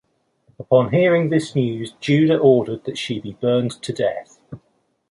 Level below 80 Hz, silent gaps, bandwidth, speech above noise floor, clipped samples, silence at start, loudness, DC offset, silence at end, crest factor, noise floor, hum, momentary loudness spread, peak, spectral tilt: -58 dBFS; none; 11.5 kHz; 48 dB; under 0.1%; 0.6 s; -19 LUFS; under 0.1%; 0.55 s; 18 dB; -66 dBFS; none; 11 LU; -2 dBFS; -7 dB/octave